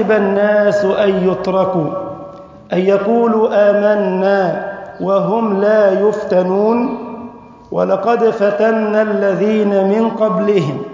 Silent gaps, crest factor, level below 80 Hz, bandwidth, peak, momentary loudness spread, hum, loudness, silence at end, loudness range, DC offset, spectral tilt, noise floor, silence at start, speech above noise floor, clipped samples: none; 12 dB; -54 dBFS; 7.6 kHz; -2 dBFS; 11 LU; none; -14 LUFS; 0 s; 2 LU; under 0.1%; -8 dB/octave; -34 dBFS; 0 s; 21 dB; under 0.1%